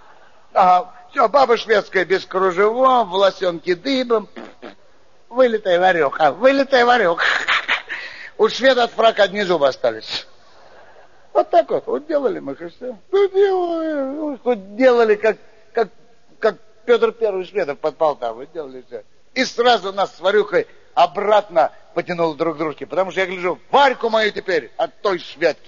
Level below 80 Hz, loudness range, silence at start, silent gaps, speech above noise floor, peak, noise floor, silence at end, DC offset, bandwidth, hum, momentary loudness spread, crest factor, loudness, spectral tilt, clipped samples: -62 dBFS; 5 LU; 0.55 s; none; 38 dB; -2 dBFS; -55 dBFS; 0.15 s; 0.5%; 7.2 kHz; none; 12 LU; 16 dB; -18 LUFS; -1.5 dB/octave; under 0.1%